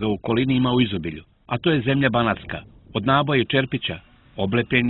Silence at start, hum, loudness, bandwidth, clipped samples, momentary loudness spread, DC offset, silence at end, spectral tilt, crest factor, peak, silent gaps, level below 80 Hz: 0 s; none; -22 LUFS; 4.2 kHz; under 0.1%; 14 LU; under 0.1%; 0 s; -10.5 dB/octave; 16 dB; -4 dBFS; none; -48 dBFS